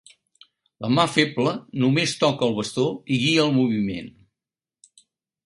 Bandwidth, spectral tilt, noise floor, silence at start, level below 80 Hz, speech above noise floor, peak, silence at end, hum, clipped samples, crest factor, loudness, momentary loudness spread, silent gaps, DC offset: 11.5 kHz; -5 dB/octave; under -90 dBFS; 0.8 s; -60 dBFS; over 68 dB; -4 dBFS; 1.35 s; none; under 0.1%; 20 dB; -22 LUFS; 8 LU; none; under 0.1%